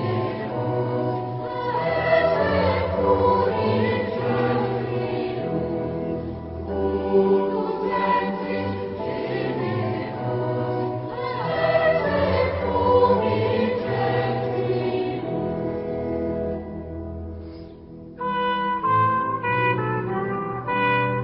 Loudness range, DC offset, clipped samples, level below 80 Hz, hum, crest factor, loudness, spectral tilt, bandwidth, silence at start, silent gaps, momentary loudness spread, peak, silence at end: 5 LU; under 0.1%; under 0.1%; -42 dBFS; none; 16 dB; -23 LUFS; -11.5 dB/octave; 5.8 kHz; 0 s; none; 9 LU; -6 dBFS; 0 s